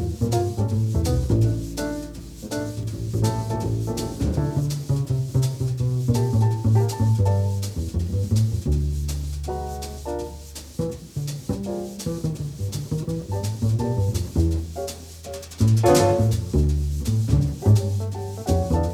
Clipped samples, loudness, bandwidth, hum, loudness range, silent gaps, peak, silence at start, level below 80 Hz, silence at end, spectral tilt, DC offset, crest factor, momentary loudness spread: under 0.1%; -24 LUFS; 15 kHz; none; 8 LU; none; -4 dBFS; 0 s; -34 dBFS; 0 s; -7 dB/octave; under 0.1%; 18 dB; 11 LU